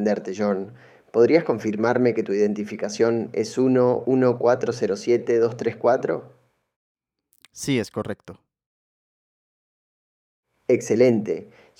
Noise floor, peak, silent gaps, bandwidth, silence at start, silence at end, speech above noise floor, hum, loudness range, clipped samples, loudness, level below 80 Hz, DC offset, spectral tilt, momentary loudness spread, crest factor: -60 dBFS; -4 dBFS; 6.76-6.95 s, 8.66-10.43 s; 14.5 kHz; 0 s; 0.35 s; 39 dB; none; 12 LU; under 0.1%; -22 LUFS; -70 dBFS; under 0.1%; -6 dB/octave; 11 LU; 18 dB